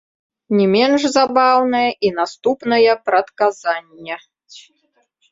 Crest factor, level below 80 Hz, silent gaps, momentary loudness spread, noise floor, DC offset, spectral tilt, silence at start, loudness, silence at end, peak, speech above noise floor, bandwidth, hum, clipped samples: 16 dB; -62 dBFS; none; 12 LU; -64 dBFS; under 0.1%; -4.5 dB/octave; 0.5 s; -16 LUFS; 0.7 s; -2 dBFS; 48 dB; 7.8 kHz; none; under 0.1%